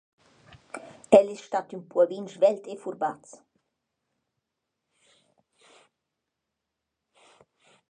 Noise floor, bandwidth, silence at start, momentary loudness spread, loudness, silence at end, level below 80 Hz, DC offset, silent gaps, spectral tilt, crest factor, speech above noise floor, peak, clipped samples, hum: -84 dBFS; 10 kHz; 0.75 s; 23 LU; -25 LUFS; 4.8 s; -72 dBFS; under 0.1%; none; -5.5 dB/octave; 28 dB; 60 dB; -2 dBFS; under 0.1%; none